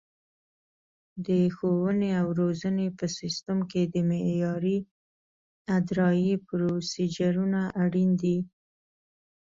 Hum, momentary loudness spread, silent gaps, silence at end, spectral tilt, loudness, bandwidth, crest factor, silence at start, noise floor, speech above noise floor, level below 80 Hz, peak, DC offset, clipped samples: none; 7 LU; 4.91-5.65 s; 1 s; -7 dB/octave; -27 LUFS; 7.6 kHz; 14 dB; 1.15 s; under -90 dBFS; over 64 dB; -64 dBFS; -14 dBFS; under 0.1%; under 0.1%